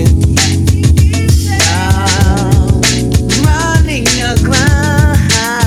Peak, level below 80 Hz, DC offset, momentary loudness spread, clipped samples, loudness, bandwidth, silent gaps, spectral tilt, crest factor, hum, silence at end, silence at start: 0 dBFS; -18 dBFS; under 0.1%; 2 LU; 0.6%; -10 LUFS; 16 kHz; none; -4.5 dB/octave; 10 dB; none; 0 s; 0 s